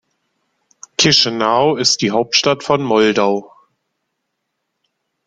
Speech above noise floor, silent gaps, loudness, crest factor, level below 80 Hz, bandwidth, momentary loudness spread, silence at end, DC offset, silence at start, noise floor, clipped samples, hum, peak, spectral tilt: 59 dB; none; -14 LUFS; 18 dB; -56 dBFS; 11 kHz; 6 LU; 1.8 s; under 0.1%; 1 s; -74 dBFS; under 0.1%; none; 0 dBFS; -3 dB/octave